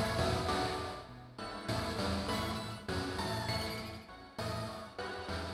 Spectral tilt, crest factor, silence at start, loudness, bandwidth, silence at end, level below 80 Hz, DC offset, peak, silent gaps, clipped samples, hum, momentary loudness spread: -5 dB/octave; 18 dB; 0 s; -38 LUFS; 16.5 kHz; 0 s; -52 dBFS; under 0.1%; -20 dBFS; none; under 0.1%; none; 12 LU